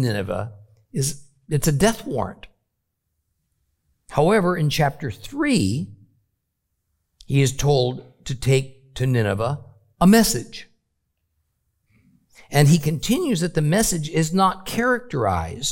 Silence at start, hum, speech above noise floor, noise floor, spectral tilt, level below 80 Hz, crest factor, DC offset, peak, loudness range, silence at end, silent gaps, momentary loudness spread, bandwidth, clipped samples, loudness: 0 s; none; 56 dB; -76 dBFS; -5.5 dB/octave; -44 dBFS; 20 dB; under 0.1%; -2 dBFS; 5 LU; 0 s; none; 15 LU; 17 kHz; under 0.1%; -21 LUFS